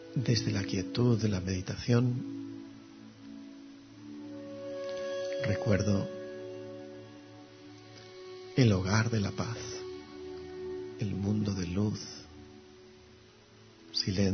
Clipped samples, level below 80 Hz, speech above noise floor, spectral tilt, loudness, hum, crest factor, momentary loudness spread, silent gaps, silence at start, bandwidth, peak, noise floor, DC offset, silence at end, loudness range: under 0.1%; -60 dBFS; 27 dB; -6 dB/octave; -32 LUFS; none; 22 dB; 22 LU; none; 0 s; 6.6 kHz; -10 dBFS; -57 dBFS; under 0.1%; 0 s; 5 LU